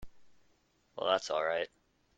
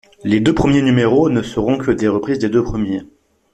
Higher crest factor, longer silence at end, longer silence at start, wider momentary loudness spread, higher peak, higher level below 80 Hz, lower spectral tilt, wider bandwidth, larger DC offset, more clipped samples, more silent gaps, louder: first, 22 dB vs 16 dB; about the same, 0.5 s vs 0.45 s; second, 0 s vs 0.25 s; first, 12 LU vs 7 LU; second, -14 dBFS vs 0 dBFS; second, -64 dBFS vs -38 dBFS; second, -2 dB/octave vs -7 dB/octave; about the same, 9.2 kHz vs 9.8 kHz; neither; neither; neither; second, -34 LUFS vs -16 LUFS